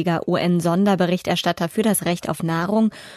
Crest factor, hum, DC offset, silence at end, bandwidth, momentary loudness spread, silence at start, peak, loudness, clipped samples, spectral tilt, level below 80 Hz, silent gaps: 14 dB; none; under 0.1%; 0 s; 13.5 kHz; 5 LU; 0 s; -6 dBFS; -20 LUFS; under 0.1%; -5.5 dB/octave; -56 dBFS; none